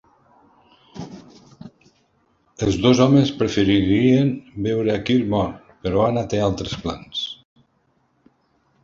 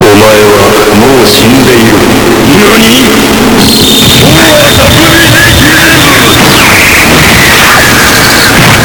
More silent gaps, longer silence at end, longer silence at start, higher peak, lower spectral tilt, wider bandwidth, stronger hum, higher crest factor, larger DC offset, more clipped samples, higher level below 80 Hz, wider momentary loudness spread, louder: neither; first, 1.5 s vs 0 s; first, 0.95 s vs 0 s; about the same, -2 dBFS vs 0 dBFS; first, -6.5 dB/octave vs -3.5 dB/octave; second, 7.6 kHz vs over 20 kHz; neither; first, 20 dB vs 2 dB; neither; second, under 0.1% vs 30%; second, -44 dBFS vs -20 dBFS; first, 18 LU vs 2 LU; second, -20 LUFS vs -1 LUFS